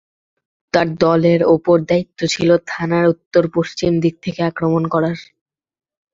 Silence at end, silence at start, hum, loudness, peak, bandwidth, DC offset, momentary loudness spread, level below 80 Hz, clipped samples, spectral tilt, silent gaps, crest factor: 0.9 s; 0.75 s; none; -16 LUFS; 0 dBFS; 7.8 kHz; under 0.1%; 7 LU; -52 dBFS; under 0.1%; -6.5 dB/octave; 3.26-3.31 s; 16 dB